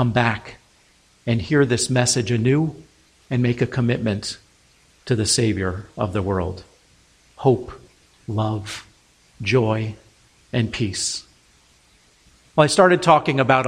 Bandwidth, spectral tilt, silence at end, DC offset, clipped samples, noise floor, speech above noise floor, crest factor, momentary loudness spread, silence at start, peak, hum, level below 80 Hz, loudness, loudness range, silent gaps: 15.5 kHz; -5 dB/octave; 0 s; under 0.1%; under 0.1%; -57 dBFS; 37 dB; 20 dB; 15 LU; 0 s; -2 dBFS; none; -50 dBFS; -21 LUFS; 5 LU; none